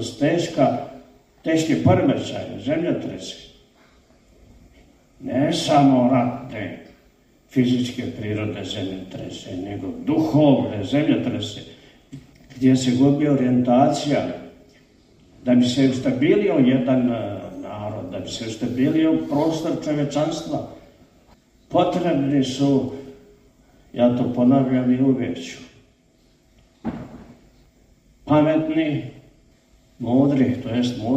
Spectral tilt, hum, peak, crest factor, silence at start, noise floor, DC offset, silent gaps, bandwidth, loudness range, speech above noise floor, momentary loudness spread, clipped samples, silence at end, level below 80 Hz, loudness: -6.5 dB/octave; none; -4 dBFS; 18 dB; 0 s; -58 dBFS; under 0.1%; none; 9.4 kHz; 6 LU; 38 dB; 15 LU; under 0.1%; 0 s; -54 dBFS; -21 LUFS